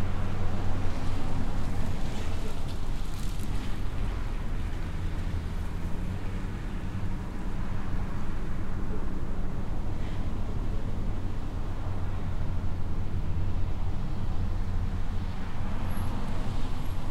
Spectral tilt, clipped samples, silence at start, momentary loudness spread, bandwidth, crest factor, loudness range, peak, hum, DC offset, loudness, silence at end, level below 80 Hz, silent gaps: -7 dB/octave; under 0.1%; 0 s; 3 LU; 8.2 kHz; 12 dB; 2 LU; -14 dBFS; none; under 0.1%; -35 LUFS; 0 s; -32 dBFS; none